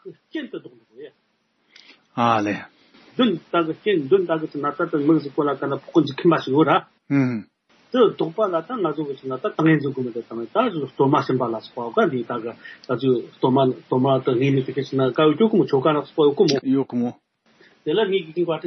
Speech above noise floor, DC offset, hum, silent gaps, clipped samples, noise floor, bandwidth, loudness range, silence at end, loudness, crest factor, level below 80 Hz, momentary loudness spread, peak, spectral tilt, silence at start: 47 dB; under 0.1%; none; none; under 0.1%; -68 dBFS; 6.4 kHz; 4 LU; 0 s; -21 LUFS; 18 dB; -72 dBFS; 11 LU; -4 dBFS; -5.5 dB/octave; 0.05 s